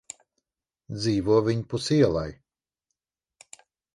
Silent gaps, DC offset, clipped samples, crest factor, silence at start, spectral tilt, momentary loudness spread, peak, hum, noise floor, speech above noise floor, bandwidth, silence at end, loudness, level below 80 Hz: none; under 0.1%; under 0.1%; 18 dB; 0.9 s; -6.5 dB/octave; 18 LU; -10 dBFS; none; -84 dBFS; 60 dB; 11.5 kHz; 1.6 s; -24 LUFS; -52 dBFS